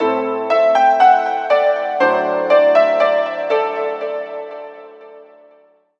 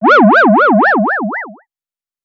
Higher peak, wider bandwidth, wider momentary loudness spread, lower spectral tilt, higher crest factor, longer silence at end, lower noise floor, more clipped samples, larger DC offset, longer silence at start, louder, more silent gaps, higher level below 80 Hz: about the same, 0 dBFS vs -2 dBFS; about the same, 7 kHz vs 6.8 kHz; about the same, 15 LU vs 16 LU; second, -4.5 dB/octave vs -7.5 dB/octave; first, 16 dB vs 10 dB; about the same, 0.8 s vs 0.7 s; second, -52 dBFS vs under -90 dBFS; neither; neither; about the same, 0 s vs 0 s; second, -15 LUFS vs -9 LUFS; neither; second, -88 dBFS vs -78 dBFS